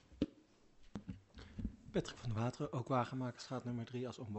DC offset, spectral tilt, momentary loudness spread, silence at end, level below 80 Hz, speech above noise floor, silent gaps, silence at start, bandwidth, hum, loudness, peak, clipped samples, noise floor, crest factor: under 0.1%; -7 dB/octave; 15 LU; 0 s; -60 dBFS; 25 dB; none; 0.1 s; 8.2 kHz; none; -43 LUFS; -22 dBFS; under 0.1%; -66 dBFS; 20 dB